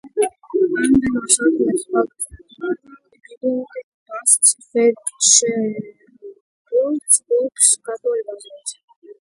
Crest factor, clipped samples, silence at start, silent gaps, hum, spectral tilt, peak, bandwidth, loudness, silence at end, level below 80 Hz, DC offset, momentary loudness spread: 20 dB; under 0.1%; 0.05 s; 3.37-3.41 s, 3.83-4.06 s, 6.41-6.65 s, 8.84-8.88 s, 8.96-9.02 s; none; -2 dB/octave; 0 dBFS; 12 kHz; -17 LUFS; 0.15 s; -54 dBFS; under 0.1%; 19 LU